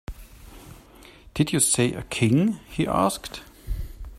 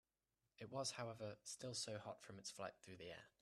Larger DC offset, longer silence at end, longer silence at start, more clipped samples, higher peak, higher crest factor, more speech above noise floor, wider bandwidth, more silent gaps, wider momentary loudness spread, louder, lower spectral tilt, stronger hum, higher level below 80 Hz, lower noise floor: neither; second, 0 s vs 0.15 s; second, 0.1 s vs 0.6 s; neither; first, -6 dBFS vs -34 dBFS; about the same, 18 dB vs 20 dB; second, 26 dB vs over 38 dB; first, 16 kHz vs 13.5 kHz; neither; first, 18 LU vs 10 LU; first, -23 LUFS vs -51 LUFS; first, -4.5 dB/octave vs -3 dB/octave; neither; first, -40 dBFS vs -84 dBFS; second, -49 dBFS vs under -90 dBFS